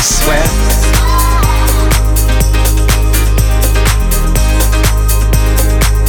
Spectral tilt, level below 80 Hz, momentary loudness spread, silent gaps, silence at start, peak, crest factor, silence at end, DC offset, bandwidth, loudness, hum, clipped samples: -4 dB/octave; -10 dBFS; 1 LU; none; 0 s; 0 dBFS; 8 dB; 0 s; under 0.1%; over 20 kHz; -11 LUFS; none; under 0.1%